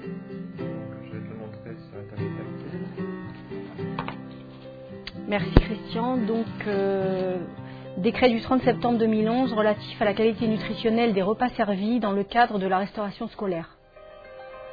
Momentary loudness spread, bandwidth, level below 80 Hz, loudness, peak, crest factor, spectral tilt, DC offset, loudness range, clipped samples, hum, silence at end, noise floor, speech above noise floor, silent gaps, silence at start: 18 LU; 5 kHz; -38 dBFS; -26 LUFS; 0 dBFS; 26 dB; -9 dB/octave; under 0.1%; 12 LU; under 0.1%; none; 0 s; -48 dBFS; 24 dB; none; 0 s